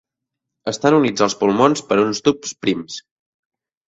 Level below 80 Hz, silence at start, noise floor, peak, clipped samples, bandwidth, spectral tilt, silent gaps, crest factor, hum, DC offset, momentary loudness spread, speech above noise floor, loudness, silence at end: -58 dBFS; 0.65 s; -82 dBFS; 0 dBFS; under 0.1%; 8 kHz; -4.5 dB/octave; none; 18 dB; none; under 0.1%; 13 LU; 64 dB; -18 LUFS; 0.9 s